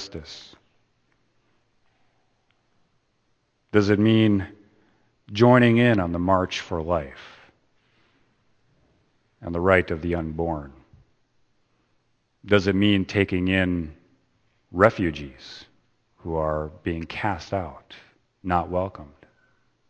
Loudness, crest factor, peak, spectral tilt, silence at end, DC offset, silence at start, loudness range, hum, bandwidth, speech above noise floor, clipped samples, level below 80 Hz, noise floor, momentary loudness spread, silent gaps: -23 LUFS; 26 dB; 0 dBFS; -7 dB/octave; 0.85 s; under 0.1%; 0 s; 9 LU; none; 8.6 kHz; 47 dB; under 0.1%; -48 dBFS; -69 dBFS; 21 LU; none